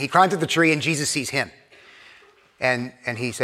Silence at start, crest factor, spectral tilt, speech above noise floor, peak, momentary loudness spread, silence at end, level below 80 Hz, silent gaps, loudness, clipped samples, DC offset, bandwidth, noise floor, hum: 0 s; 22 dB; -3.5 dB/octave; 31 dB; -2 dBFS; 9 LU; 0 s; -66 dBFS; none; -22 LUFS; under 0.1%; under 0.1%; 16 kHz; -53 dBFS; none